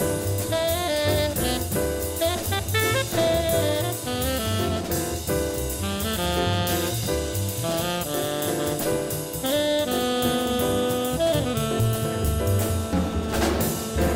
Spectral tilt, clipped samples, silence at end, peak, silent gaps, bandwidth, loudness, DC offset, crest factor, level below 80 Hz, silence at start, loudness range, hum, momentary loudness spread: -4.5 dB/octave; under 0.1%; 0 s; -10 dBFS; none; 16.5 kHz; -24 LUFS; under 0.1%; 14 dB; -38 dBFS; 0 s; 2 LU; none; 4 LU